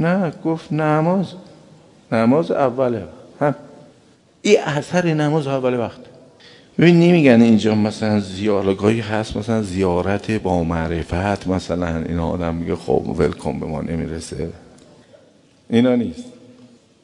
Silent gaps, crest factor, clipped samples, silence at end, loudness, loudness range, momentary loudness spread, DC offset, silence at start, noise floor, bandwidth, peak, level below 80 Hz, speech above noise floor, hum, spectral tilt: none; 18 dB; under 0.1%; 0.75 s; -19 LUFS; 8 LU; 12 LU; under 0.1%; 0 s; -52 dBFS; 11 kHz; 0 dBFS; -46 dBFS; 35 dB; none; -7 dB/octave